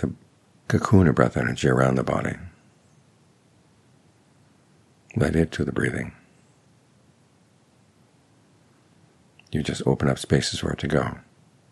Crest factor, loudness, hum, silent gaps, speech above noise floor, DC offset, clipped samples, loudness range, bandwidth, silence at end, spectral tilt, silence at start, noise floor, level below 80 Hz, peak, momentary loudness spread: 24 dB; -23 LUFS; none; none; 37 dB; under 0.1%; under 0.1%; 12 LU; 12.5 kHz; 0.5 s; -6.5 dB/octave; 0 s; -59 dBFS; -48 dBFS; -2 dBFS; 16 LU